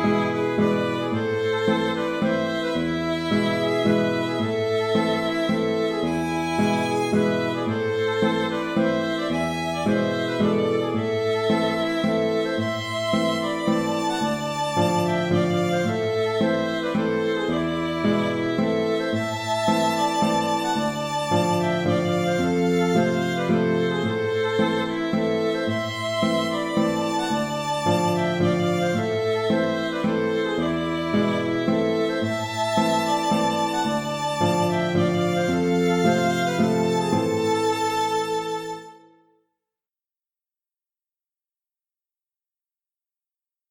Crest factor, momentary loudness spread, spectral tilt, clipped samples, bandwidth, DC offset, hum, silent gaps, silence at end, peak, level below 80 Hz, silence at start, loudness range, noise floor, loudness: 16 dB; 4 LU; -5.5 dB/octave; under 0.1%; 18.5 kHz; under 0.1%; none; none; 4.75 s; -8 dBFS; -58 dBFS; 0 s; 2 LU; under -90 dBFS; -23 LUFS